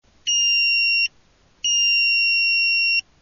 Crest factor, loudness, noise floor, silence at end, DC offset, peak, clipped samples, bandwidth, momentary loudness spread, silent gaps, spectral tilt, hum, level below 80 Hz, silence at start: 8 dB; -16 LUFS; -57 dBFS; 0.2 s; under 0.1%; -12 dBFS; under 0.1%; 7 kHz; 5 LU; none; 6.5 dB/octave; none; -62 dBFS; 0.25 s